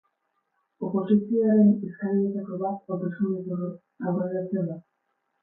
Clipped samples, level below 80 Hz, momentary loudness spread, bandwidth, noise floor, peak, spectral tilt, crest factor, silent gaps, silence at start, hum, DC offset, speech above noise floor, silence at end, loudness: under 0.1%; -74 dBFS; 13 LU; 3.6 kHz; -76 dBFS; -10 dBFS; -13.5 dB/octave; 16 dB; none; 0.8 s; none; under 0.1%; 51 dB; 0.65 s; -26 LUFS